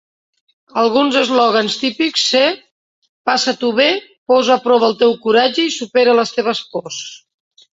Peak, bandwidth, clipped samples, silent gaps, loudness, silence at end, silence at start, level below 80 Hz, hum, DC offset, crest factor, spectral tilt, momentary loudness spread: -2 dBFS; 8 kHz; under 0.1%; 2.71-3.02 s, 3.09-3.25 s, 4.18-4.26 s; -15 LUFS; 0.55 s; 0.75 s; -64 dBFS; none; under 0.1%; 14 dB; -2.5 dB/octave; 12 LU